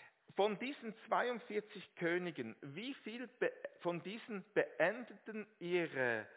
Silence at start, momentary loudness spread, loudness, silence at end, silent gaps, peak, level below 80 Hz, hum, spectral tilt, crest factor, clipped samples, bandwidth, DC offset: 0 s; 12 LU; -41 LUFS; 0 s; none; -18 dBFS; under -90 dBFS; none; -3.5 dB/octave; 22 dB; under 0.1%; 4 kHz; under 0.1%